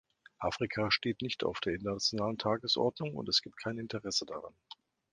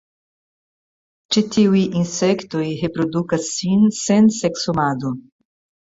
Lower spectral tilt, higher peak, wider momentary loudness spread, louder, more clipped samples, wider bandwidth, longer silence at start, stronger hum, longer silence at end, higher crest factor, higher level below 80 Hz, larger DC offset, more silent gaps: second, -4 dB/octave vs -5.5 dB/octave; second, -14 dBFS vs -4 dBFS; first, 14 LU vs 8 LU; second, -33 LUFS vs -18 LUFS; neither; first, 10.5 kHz vs 8 kHz; second, 0.4 s vs 1.3 s; neither; about the same, 0.6 s vs 0.65 s; first, 22 dB vs 16 dB; second, -62 dBFS vs -56 dBFS; neither; neither